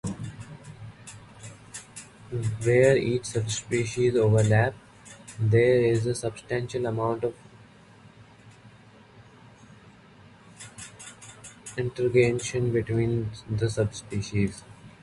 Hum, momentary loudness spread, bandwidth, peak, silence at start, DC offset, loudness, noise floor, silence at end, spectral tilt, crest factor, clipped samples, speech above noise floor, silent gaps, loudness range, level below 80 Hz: none; 23 LU; 11.5 kHz; -8 dBFS; 0.05 s; under 0.1%; -26 LUFS; -52 dBFS; 0.15 s; -6 dB/octave; 20 dB; under 0.1%; 28 dB; none; 15 LU; -52 dBFS